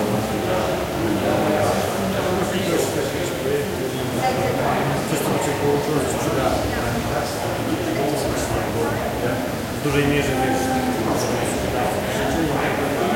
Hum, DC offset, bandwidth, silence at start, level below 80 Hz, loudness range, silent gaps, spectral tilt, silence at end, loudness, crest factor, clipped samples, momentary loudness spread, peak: none; under 0.1%; 16.5 kHz; 0 s; -40 dBFS; 1 LU; none; -5 dB/octave; 0 s; -21 LUFS; 14 dB; under 0.1%; 4 LU; -6 dBFS